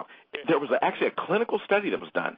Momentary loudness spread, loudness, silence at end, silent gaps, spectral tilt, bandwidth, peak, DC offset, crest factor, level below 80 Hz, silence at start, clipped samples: 5 LU; -26 LUFS; 0 s; none; -8.5 dB/octave; 5.2 kHz; -8 dBFS; under 0.1%; 18 dB; -76 dBFS; 0 s; under 0.1%